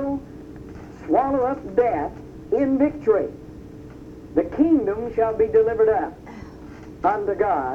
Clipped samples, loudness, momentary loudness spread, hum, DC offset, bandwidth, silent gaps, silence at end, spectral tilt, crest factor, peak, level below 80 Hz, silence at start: under 0.1%; -22 LUFS; 21 LU; none; under 0.1%; 6.8 kHz; none; 0 s; -9 dB/octave; 16 dB; -6 dBFS; -46 dBFS; 0 s